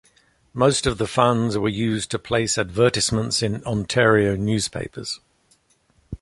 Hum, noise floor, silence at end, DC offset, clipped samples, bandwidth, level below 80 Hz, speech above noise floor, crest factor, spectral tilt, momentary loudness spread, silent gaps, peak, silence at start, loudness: none; -62 dBFS; 0.05 s; under 0.1%; under 0.1%; 11.5 kHz; -44 dBFS; 41 dB; 20 dB; -4.5 dB/octave; 13 LU; none; -2 dBFS; 0.55 s; -21 LUFS